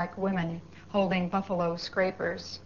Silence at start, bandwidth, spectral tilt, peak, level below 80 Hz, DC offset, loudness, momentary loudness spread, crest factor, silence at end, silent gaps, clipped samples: 0 s; 7.2 kHz; -5 dB/octave; -14 dBFS; -60 dBFS; 0.2%; -30 LUFS; 6 LU; 16 dB; 0 s; none; under 0.1%